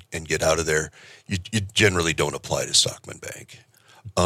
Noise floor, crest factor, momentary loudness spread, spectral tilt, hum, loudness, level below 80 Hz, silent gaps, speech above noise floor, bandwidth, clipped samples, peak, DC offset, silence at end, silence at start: -45 dBFS; 20 dB; 17 LU; -3 dB/octave; none; -22 LUFS; -48 dBFS; none; 21 dB; 16 kHz; under 0.1%; -4 dBFS; under 0.1%; 0 s; 0.1 s